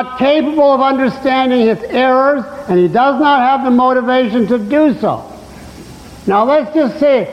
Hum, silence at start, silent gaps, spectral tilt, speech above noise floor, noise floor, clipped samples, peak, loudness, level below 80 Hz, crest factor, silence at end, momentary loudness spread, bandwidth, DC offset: none; 0 s; none; -7 dB/octave; 21 dB; -33 dBFS; under 0.1%; -2 dBFS; -12 LUFS; -46 dBFS; 10 dB; 0 s; 5 LU; 12 kHz; under 0.1%